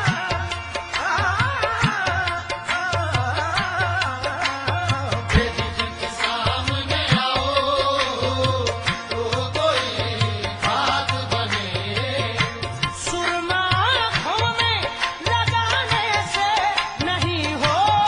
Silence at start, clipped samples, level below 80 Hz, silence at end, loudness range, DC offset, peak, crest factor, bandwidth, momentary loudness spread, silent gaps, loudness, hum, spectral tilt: 0 s; under 0.1%; -40 dBFS; 0 s; 2 LU; under 0.1%; -2 dBFS; 20 dB; 10.5 kHz; 5 LU; none; -21 LUFS; none; -4 dB/octave